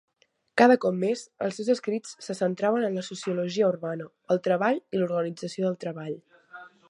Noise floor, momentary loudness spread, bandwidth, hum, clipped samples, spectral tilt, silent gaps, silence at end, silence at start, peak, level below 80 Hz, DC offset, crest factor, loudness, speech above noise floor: -49 dBFS; 15 LU; 11.5 kHz; none; under 0.1%; -6 dB/octave; none; 0.25 s; 0.55 s; -4 dBFS; -78 dBFS; under 0.1%; 22 dB; -27 LUFS; 22 dB